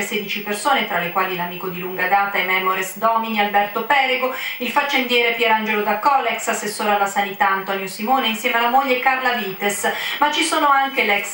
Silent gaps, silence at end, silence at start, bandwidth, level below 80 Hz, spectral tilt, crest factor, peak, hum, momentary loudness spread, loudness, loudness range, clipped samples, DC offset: none; 0 s; 0 s; 16.5 kHz; -70 dBFS; -2.5 dB/octave; 18 dB; -2 dBFS; none; 6 LU; -18 LUFS; 1 LU; under 0.1%; under 0.1%